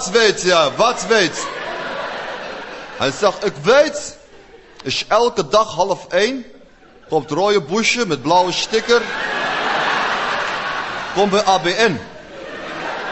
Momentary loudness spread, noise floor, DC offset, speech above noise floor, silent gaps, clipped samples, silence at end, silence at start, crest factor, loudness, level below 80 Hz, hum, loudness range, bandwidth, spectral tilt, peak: 14 LU; -46 dBFS; 0.2%; 29 dB; none; under 0.1%; 0 s; 0 s; 16 dB; -17 LUFS; -50 dBFS; none; 3 LU; 8.4 kHz; -3 dB/octave; -2 dBFS